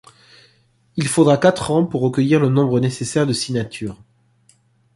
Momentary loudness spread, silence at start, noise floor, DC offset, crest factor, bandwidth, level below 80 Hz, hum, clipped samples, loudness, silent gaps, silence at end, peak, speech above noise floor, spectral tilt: 13 LU; 0.95 s; -58 dBFS; under 0.1%; 16 dB; 11.5 kHz; -52 dBFS; none; under 0.1%; -18 LUFS; none; 1 s; -2 dBFS; 41 dB; -6 dB/octave